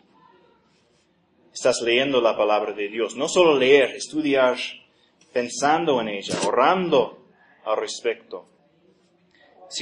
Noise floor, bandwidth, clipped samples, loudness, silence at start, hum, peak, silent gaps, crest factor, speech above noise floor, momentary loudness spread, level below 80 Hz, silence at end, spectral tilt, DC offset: -63 dBFS; 11 kHz; under 0.1%; -21 LUFS; 1.55 s; none; -4 dBFS; none; 20 dB; 42 dB; 14 LU; -68 dBFS; 0 s; -3.5 dB/octave; under 0.1%